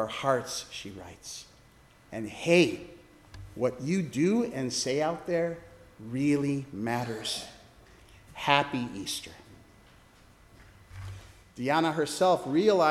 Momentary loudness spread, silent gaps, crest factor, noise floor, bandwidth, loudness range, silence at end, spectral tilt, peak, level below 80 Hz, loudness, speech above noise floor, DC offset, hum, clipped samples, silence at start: 21 LU; none; 26 dB; -58 dBFS; 15.5 kHz; 5 LU; 0 s; -4.5 dB/octave; -4 dBFS; -60 dBFS; -29 LUFS; 29 dB; under 0.1%; none; under 0.1%; 0 s